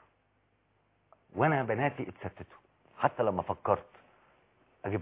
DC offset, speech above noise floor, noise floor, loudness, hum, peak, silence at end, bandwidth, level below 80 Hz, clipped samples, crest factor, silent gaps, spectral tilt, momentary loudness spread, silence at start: under 0.1%; 41 dB; -72 dBFS; -32 LUFS; none; -10 dBFS; 0 s; 4 kHz; -62 dBFS; under 0.1%; 24 dB; none; -6 dB/octave; 15 LU; 1.35 s